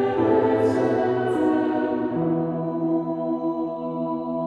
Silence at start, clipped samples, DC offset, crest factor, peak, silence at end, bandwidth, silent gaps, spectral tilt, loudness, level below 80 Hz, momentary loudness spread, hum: 0 s; under 0.1%; under 0.1%; 14 dB; -8 dBFS; 0 s; 9.4 kHz; none; -8.5 dB/octave; -23 LUFS; -58 dBFS; 7 LU; none